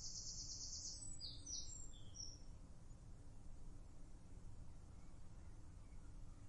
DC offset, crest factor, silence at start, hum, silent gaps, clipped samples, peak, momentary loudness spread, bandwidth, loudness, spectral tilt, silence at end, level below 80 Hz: under 0.1%; 16 dB; 0 s; none; none; under 0.1%; -36 dBFS; 14 LU; 11 kHz; -54 LUFS; -2 dB/octave; 0 s; -58 dBFS